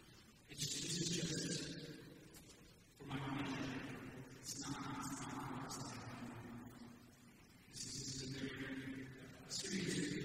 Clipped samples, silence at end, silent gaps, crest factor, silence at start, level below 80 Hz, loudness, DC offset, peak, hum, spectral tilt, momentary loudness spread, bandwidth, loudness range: under 0.1%; 0 s; none; 20 dB; 0 s; -68 dBFS; -46 LUFS; under 0.1%; -28 dBFS; none; -3.5 dB/octave; 19 LU; 16 kHz; 5 LU